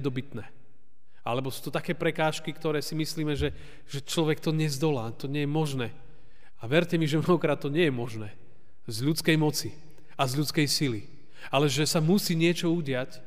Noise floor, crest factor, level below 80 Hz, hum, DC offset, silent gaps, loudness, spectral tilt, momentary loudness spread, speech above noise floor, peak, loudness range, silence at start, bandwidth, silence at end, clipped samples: -68 dBFS; 20 dB; -56 dBFS; none; 1%; none; -28 LUFS; -5 dB/octave; 15 LU; 40 dB; -10 dBFS; 4 LU; 0 s; 15.5 kHz; 0.05 s; under 0.1%